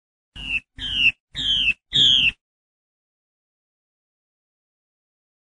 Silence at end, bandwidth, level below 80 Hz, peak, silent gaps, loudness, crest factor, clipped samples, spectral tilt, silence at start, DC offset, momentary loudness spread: 3.15 s; 11.5 kHz; -48 dBFS; -6 dBFS; 1.20-1.28 s; -18 LUFS; 18 dB; under 0.1%; -1 dB/octave; 0.35 s; 0.1%; 12 LU